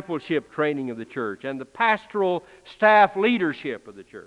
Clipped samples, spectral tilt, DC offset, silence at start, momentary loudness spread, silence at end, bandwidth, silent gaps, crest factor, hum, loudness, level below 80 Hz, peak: under 0.1%; -6.5 dB/octave; under 0.1%; 0 s; 16 LU; 0.05 s; 10.5 kHz; none; 20 dB; none; -23 LUFS; -68 dBFS; -4 dBFS